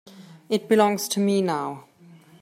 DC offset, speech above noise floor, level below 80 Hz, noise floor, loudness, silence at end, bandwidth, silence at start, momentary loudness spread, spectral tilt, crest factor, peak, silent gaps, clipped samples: under 0.1%; 29 dB; -74 dBFS; -51 dBFS; -23 LUFS; 0.6 s; 16 kHz; 0.15 s; 12 LU; -5 dB/octave; 18 dB; -6 dBFS; none; under 0.1%